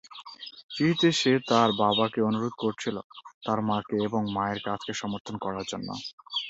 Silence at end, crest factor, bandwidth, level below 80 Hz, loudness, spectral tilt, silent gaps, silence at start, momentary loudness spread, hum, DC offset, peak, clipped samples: 0 s; 20 dB; 8.2 kHz; -64 dBFS; -27 LUFS; -5 dB/octave; 0.63-0.69 s, 3.04-3.10 s, 3.34-3.41 s, 5.20-5.25 s, 6.13-6.18 s; 0.05 s; 16 LU; none; under 0.1%; -8 dBFS; under 0.1%